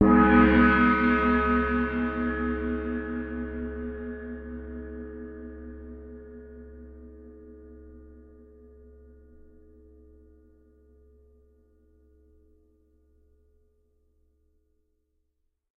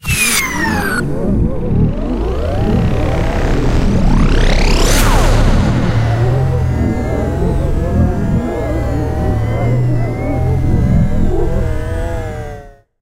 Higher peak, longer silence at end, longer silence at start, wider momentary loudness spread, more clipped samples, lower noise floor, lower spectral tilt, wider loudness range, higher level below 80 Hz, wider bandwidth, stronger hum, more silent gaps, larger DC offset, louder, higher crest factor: second, -6 dBFS vs 0 dBFS; first, 7.65 s vs 0.3 s; about the same, 0 s vs 0.05 s; first, 29 LU vs 6 LU; neither; first, -76 dBFS vs -33 dBFS; about the same, -5.5 dB/octave vs -5.5 dB/octave; first, 27 LU vs 3 LU; second, -42 dBFS vs -16 dBFS; second, 4.8 kHz vs 16 kHz; neither; neither; neither; second, -24 LUFS vs -15 LUFS; first, 22 dB vs 12 dB